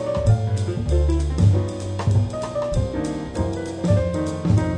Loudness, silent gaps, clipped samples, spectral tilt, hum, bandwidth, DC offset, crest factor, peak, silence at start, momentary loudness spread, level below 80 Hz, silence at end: -22 LUFS; none; under 0.1%; -7.5 dB/octave; none; 10 kHz; under 0.1%; 16 dB; -4 dBFS; 0 s; 7 LU; -28 dBFS; 0 s